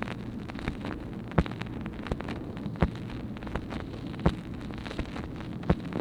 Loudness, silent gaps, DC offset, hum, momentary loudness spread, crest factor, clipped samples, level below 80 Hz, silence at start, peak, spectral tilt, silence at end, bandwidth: -34 LUFS; none; under 0.1%; none; 8 LU; 28 dB; under 0.1%; -40 dBFS; 0 s; -4 dBFS; -7.5 dB/octave; 0 s; 11.5 kHz